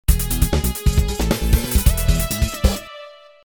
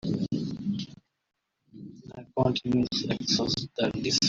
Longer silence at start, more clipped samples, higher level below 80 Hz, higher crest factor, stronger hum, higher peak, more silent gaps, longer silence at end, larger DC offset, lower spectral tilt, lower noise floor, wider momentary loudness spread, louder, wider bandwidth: about the same, 0.1 s vs 0.05 s; neither; first, -20 dBFS vs -58 dBFS; about the same, 18 dB vs 18 dB; neither; first, 0 dBFS vs -12 dBFS; neither; first, 0.35 s vs 0 s; neither; about the same, -4.5 dB/octave vs -4.5 dB/octave; second, -40 dBFS vs -50 dBFS; second, 4 LU vs 20 LU; first, -20 LUFS vs -28 LUFS; first, over 20 kHz vs 7.8 kHz